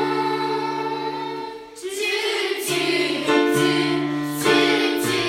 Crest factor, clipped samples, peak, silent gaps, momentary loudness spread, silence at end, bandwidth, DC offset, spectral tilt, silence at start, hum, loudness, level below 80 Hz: 16 dB; under 0.1%; -4 dBFS; none; 11 LU; 0 s; 16.5 kHz; under 0.1%; -3.5 dB/octave; 0 s; none; -21 LUFS; -64 dBFS